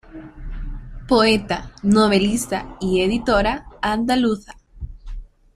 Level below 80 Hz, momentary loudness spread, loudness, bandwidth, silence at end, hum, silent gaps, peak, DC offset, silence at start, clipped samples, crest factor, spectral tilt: -34 dBFS; 22 LU; -19 LUFS; 15 kHz; 0.3 s; none; none; -2 dBFS; under 0.1%; 0.05 s; under 0.1%; 18 dB; -5 dB/octave